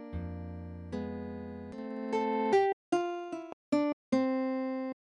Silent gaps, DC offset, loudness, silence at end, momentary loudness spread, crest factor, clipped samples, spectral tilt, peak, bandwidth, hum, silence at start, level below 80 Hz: 2.73-2.92 s, 3.53-3.72 s, 3.93-4.12 s; under 0.1%; -33 LUFS; 0.15 s; 14 LU; 16 dB; under 0.1%; -7 dB/octave; -16 dBFS; 10.5 kHz; none; 0 s; -56 dBFS